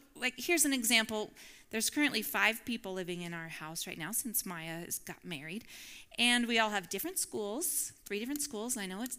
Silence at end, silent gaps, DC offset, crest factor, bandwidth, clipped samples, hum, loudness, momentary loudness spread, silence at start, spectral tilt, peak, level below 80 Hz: 0 s; none; under 0.1%; 24 dB; 16.5 kHz; under 0.1%; none; -33 LUFS; 14 LU; 0.15 s; -1.5 dB/octave; -12 dBFS; -68 dBFS